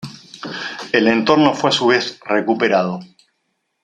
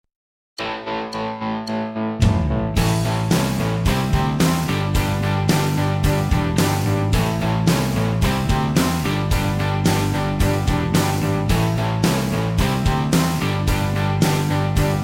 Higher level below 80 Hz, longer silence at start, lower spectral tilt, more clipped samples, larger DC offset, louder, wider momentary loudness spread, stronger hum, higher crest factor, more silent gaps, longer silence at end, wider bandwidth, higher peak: second, -60 dBFS vs -28 dBFS; second, 0 s vs 0.6 s; about the same, -4.5 dB/octave vs -5.5 dB/octave; neither; neither; first, -16 LUFS vs -20 LUFS; first, 16 LU vs 6 LU; neither; about the same, 18 dB vs 14 dB; neither; first, 0.8 s vs 0 s; second, 10 kHz vs 17 kHz; first, 0 dBFS vs -4 dBFS